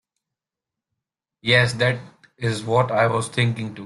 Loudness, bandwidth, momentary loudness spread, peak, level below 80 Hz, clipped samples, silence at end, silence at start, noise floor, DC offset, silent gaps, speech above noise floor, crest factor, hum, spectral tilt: -21 LUFS; 11.5 kHz; 10 LU; -2 dBFS; -56 dBFS; under 0.1%; 0 s; 1.45 s; -87 dBFS; under 0.1%; none; 67 dB; 20 dB; none; -5 dB/octave